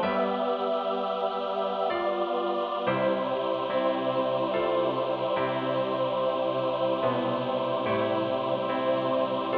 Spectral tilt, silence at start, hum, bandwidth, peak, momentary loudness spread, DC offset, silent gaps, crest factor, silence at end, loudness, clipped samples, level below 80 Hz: -8 dB/octave; 0 s; none; 5.4 kHz; -12 dBFS; 2 LU; under 0.1%; none; 14 dB; 0 s; -28 LUFS; under 0.1%; -68 dBFS